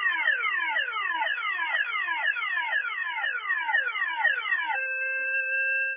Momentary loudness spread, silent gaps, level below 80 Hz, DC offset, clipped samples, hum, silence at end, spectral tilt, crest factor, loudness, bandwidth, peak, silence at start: 4 LU; none; under -90 dBFS; under 0.1%; under 0.1%; none; 0 s; 10 dB/octave; 14 dB; -26 LUFS; 3.7 kHz; -14 dBFS; 0 s